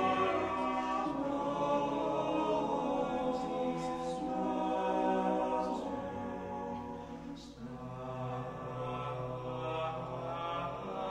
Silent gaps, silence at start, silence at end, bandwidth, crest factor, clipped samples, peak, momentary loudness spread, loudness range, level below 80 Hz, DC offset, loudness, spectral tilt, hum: none; 0 s; 0 s; 11 kHz; 14 dB; under 0.1%; -20 dBFS; 10 LU; 7 LU; -60 dBFS; under 0.1%; -36 LUFS; -6.5 dB/octave; none